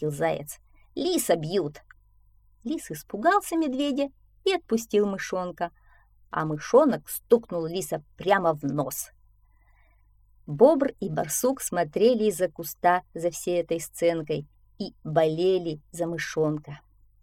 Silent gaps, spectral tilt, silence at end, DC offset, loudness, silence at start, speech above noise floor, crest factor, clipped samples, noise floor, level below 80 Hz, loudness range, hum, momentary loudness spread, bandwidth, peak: none; -5 dB/octave; 0.45 s; under 0.1%; -26 LUFS; 0 s; 34 dB; 22 dB; under 0.1%; -59 dBFS; -60 dBFS; 4 LU; none; 13 LU; 17 kHz; -4 dBFS